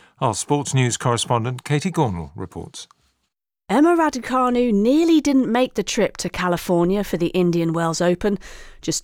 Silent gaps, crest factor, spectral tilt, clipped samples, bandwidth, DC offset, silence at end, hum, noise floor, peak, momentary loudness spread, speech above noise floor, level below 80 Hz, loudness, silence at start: none; 14 dB; -5.5 dB/octave; under 0.1%; 17 kHz; under 0.1%; 0 s; none; -76 dBFS; -6 dBFS; 13 LU; 57 dB; -46 dBFS; -20 LUFS; 0.2 s